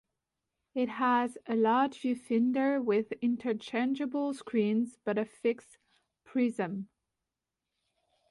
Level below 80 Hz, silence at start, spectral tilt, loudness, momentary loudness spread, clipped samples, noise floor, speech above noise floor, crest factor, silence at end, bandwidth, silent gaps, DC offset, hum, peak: -78 dBFS; 0.75 s; -6.5 dB/octave; -31 LUFS; 8 LU; under 0.1%; -89 dBFS; 58 dB; 14 dB; 1.45 s; 11.5 kHz; none; under 0.1%; none; -18 dBFS